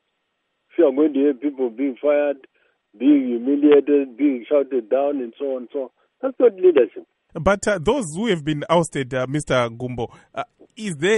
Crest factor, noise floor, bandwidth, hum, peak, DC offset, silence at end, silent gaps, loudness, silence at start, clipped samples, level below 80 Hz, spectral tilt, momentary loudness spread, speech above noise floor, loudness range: 16 dB; -73 dBFS; 11.5 kHz; none; -4 dBFS; under 0.1%; 0 s; none; -20 LUFS; 0.8 s; under 0.1%; -50 dBFS; -6 dB/octave; 15 LU; 54 dB; 3 LU